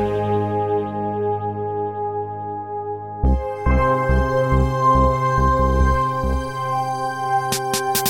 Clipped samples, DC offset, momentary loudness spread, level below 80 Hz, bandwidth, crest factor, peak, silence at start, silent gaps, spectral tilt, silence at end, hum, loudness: under 0.1%; under 0.1%; 9 LU; -26 dBFS; 17.5 kHz; 16 dB; -4 dBFS; 0 s; none; -5.5 dB/octave; 0 s; none; -20 LUFS